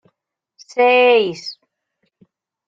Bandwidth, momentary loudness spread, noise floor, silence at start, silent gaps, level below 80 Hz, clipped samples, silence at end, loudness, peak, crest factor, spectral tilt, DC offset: 7.6 kHz; 19 LU; -73 dBFS; 0.75 s; none; -72 dBFS; under 0.1%; 1.15 s; -14 LUFS; -2 dBFS; 16 dB; -4 dB/octave; under 0.1%